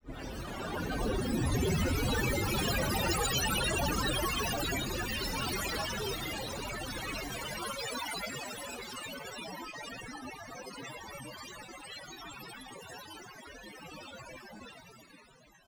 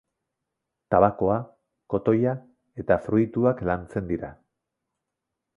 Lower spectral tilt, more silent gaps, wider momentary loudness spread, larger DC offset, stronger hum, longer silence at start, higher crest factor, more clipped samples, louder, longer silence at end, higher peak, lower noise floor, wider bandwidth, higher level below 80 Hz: second, -3.5 dB/octave vs -10.5 dB/octave; neither; about the same, 17 LU vs 15 LU; neither; neither; second, 0.05 s vs 0.9 s; second, 18 dB vs 24 dB; neither; second, -34 LUFS vs -24 LUFS; second, 0.35 s vs 1.25 s; second, -18 dBFS vs -2 dBFS; second, -60 dBFS vs -84 dBFS; first, over 20 kHz vs 10 kHz; first, -44 dBFS vs -50 dBFS